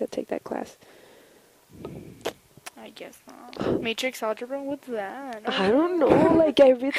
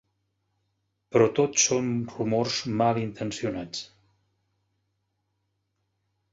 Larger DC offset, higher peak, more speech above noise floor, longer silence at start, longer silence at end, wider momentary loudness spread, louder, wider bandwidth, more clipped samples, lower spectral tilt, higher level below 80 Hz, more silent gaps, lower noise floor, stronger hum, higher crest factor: neither; about the same, -4 dBFS vs -6 dBFS; second, 33 dB vs 51 dB; second, 0 s vs 1.1 s; second, 0 s vs 2.45 s; first, 24 LU vs 12 LU; about the same, -24 LUFS vs -25 LUFS; first, 15.5 kHz vs 8 kHz; neither; first, -5.5 dB/octave vs -4 dB/octave; first, -56 dBFS vs -62 dBFS; neither; second, -56 dBFS vs -77 dBFS; neither; about the same, 20 dB vs 22 dB